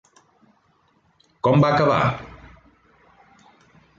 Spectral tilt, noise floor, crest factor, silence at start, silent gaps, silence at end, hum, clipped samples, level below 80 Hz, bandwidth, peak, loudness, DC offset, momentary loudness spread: -7.5 dB/octave; -63 dBFS; 18 dB; 1.45 s; none; 1.7 s; none; under 0.1%; -52 dBFS; 7.4 kHz; -6 dBFS; -19 LUFS; under 0.1%; 17 LU